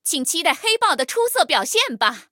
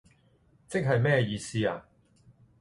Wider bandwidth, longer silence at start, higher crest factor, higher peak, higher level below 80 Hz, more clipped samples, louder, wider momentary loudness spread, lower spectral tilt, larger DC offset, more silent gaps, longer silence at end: first, 17.5 kHz vs 11.5 kHz; second, 0.05 s vs 0.7 s; about the same, 18 dB vs 20 dB; first, -2 dBFS vs -12 dBFS; second, -78 dBFS vs -60 dBFS; neither; first, -18 LUFS vs -28 LUFS; second, 3 LU vs 9 LU; second, 0 dB/octave vs -6 dB/octave; neither; neither; second, 0.1 s vs 0.8 s